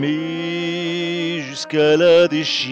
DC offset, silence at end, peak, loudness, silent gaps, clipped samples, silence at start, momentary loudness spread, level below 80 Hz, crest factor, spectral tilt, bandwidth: under 0.1%; 0 s; -6 dBFS; -18 LUFS; none; under 0.1%; 0 s; 11 LU; -66 dBFS; 12 dB; -5 dB/octave; 8.6 kHz